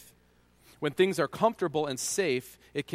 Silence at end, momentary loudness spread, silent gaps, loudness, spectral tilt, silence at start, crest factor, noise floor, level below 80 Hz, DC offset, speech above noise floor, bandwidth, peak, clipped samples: 0 s; 9 LU; none; -29 LUFS; -4 dB/octave; 0 s; 20 dB; -64 dBFS; -68 dBFS; under 0.1%; 34 dB; 16 kHz; -10 dBFS; under 0.1%